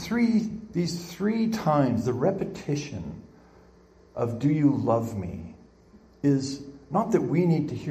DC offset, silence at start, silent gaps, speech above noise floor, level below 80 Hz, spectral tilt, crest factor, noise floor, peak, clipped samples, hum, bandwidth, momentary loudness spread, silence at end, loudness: under 0.1%; 0 s; none; 30 dB; -58 dBFS; -7 dB/octave; 18 dB; -55 dBFS; -8 dBFS; under 0.1%; none; 15 kHz; 14 LU; 0 s; -26 LUFS